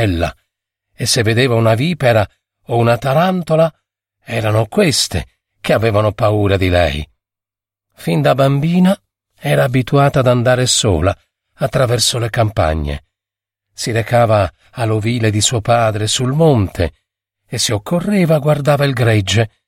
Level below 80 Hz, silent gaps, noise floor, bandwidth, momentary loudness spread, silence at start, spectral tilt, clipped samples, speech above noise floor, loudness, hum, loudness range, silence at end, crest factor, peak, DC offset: -36 dBFS; none; -88 dBFS; 16.5 kHz; 9 LU; 0 s; -5 dB/octave; under 0.1%; 74 dB; -15 LUFS; none; 3 LU; 0.2 s; 14 dB; 0 dBFS; under 0.1%